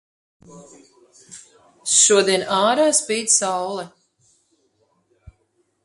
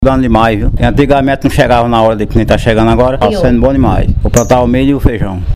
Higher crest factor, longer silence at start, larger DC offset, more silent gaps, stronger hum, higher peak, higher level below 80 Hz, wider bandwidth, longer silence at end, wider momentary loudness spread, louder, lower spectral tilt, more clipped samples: first, 22 dB vs 8 dB; first, 0.5 s vs 0 s; neither; neither; neither; about the same, -2 dBFS vs 0 dBFS; second, -62 dBFS vs -18 dBFS; second, 11.5 kHz vs 15.5 kHz; first, 1.95 s vs 0 s; first, 17 LU vs 3 LU; second, -17 LUFS vs -10 LUFS; second, -1.5 dB/octave vs -6.5 dB/octave; second, under 0.1% vs 0.4%